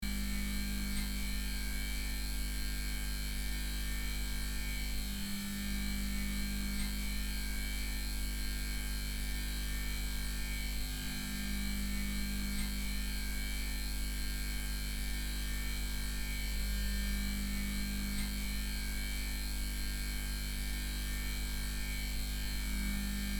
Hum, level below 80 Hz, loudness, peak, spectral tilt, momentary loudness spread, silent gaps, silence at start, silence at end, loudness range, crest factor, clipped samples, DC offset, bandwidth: 50 Hz at -40 dBFS; -38 dBFS; -38 LUFS; -24 dBFS; -3 dB/octave; 1 LU; none; 0 s; 0 s; 1 LU; 12 dB; under 0.1%; under 0.1%; 20 kHz